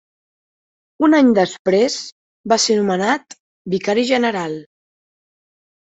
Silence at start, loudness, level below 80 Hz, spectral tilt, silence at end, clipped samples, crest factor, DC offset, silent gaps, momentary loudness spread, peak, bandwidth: 1 s; -17 LUFS; -62 dBFS; -4 dB/octave; 1.25 s; under 0.1%; 16 dB; under 0.1%; 1.59-1.65 s, 2.12-2.44 s, 3.40-3.65 s; 16 LU; -4 dBFS; 8.2 kHz